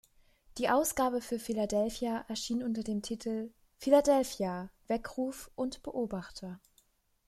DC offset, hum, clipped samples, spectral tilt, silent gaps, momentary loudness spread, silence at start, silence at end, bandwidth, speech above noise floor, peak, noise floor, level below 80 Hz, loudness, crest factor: under 0.1%; none; under 0.1%; -4.5 dB/octave; none; 15 LU; 0.55 s; 0.7 s; 15 kHz; 38 dB; -12 dBFS; -70 dBFS; -60 dBFS; -33 LUFS; 22 dB